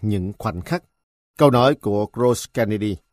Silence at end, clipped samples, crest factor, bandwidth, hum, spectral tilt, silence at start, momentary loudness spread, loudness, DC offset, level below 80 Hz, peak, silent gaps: 0.15 s; under 0.1%; 20 dB; 15.5 kHz; none; -6.5 dB/octave; 0 s; 12 LU; -20 LUFS; under 0.1%; -48 dBFS; 0 dBFS; 1.03-1.34 s